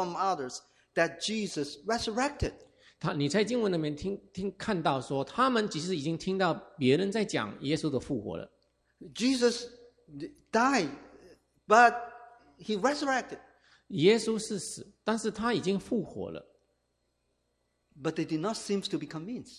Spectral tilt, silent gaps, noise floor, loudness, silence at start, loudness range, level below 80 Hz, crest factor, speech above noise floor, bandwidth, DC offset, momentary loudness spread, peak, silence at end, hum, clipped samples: -4.5 dB/octave; none; -77 dBFS; -30 LUFS; 0 s; 7 LU; -56 dBFS; 24 dB; 47 dB; 14.5 kHz; under 0.1%; 14 LU; -8 dBFS; 0 s; none; under 0.1%